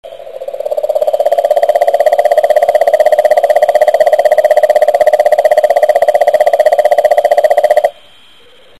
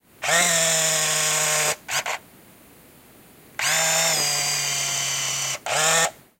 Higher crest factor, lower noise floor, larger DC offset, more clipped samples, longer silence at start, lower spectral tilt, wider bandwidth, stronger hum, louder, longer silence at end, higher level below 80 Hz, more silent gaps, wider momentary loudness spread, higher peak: second, 10 dB vs 18 dB; second, -43 dBFS vs -50 dBFS; first, 0.8% vs under 0.1%; first, 1% vs under 0.1%; second, 0.05 s vs 0.2 s; first, -1.5 dB/octave vs 0 dB/octave; second, 12.5 kHz vs 16.5 kHz; neither; first, -9 LUFS vs -20 LUFS; first, 0.9 s vs 0.25 s; first, -56 dBFS vs -66 dBFS; neither; second, 5 LU vs 8 LU; first, 0 dBFS vs -6 dBFS